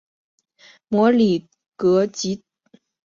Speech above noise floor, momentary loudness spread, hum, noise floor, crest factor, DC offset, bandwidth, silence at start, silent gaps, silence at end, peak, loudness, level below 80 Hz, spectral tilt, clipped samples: 39 dB; 11 LU; none; -57 dBFS; 16 dB; under 0.1%; 7.6 kHz; 0.9 s; 1.68-1.72 s; 0.7 s; -4 dBFS; -20 LUFS; -62 dBFS; -6 dB/octave; under 0.1%